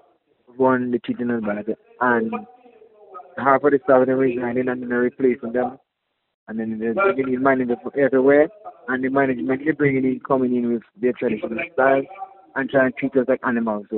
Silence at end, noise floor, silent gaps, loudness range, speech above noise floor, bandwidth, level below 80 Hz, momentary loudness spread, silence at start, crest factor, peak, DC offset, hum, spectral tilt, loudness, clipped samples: 0 s; -76 dBFS; 6.34-6.47 s; 3 LU; 56 dB; 4.1 kHz; -62 dBFS; 11 LU; 0.55 s; 20 dB; 0 dBFS; under 0.1%; none; -6 dB/octave; -21 LUFS; under 0.1%